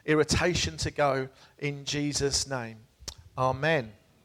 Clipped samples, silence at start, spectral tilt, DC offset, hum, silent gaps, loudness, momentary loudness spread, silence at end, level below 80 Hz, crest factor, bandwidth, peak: under 0.1%; 0.05 s; -4 dB/octave; under 0.1%; none; none; -28 LUFS; 17 LU; 0.3 s; -46 dBFS; 18 dB; 15.5 kHz; -12 dBFS